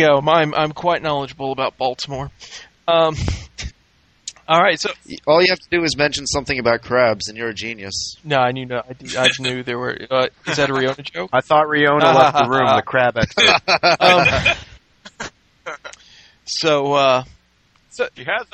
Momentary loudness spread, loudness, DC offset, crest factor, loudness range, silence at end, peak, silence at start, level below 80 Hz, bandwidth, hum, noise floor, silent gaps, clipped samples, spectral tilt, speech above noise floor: 20 LU; -17 LUFS; under 0.1%; 18 dB; 7 LU; 0.1 s; 0 dBFS; 0 s; -42 dBFS; 9 kHz; none; -58 dBFS; none; under 0.1%; -4 dB/octave; 41 dB